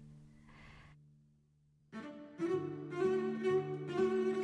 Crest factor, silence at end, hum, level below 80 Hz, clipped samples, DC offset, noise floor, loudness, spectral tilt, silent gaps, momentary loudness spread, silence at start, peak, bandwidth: 16 dB; 0 s; none; -72 dBFS; under 0.1%; under 0.1%; -71 dBFS; -36 LUFS; -7.5 dB/octave; none; 24 LU; 0 s; -22 dBFS; 9.6 kHz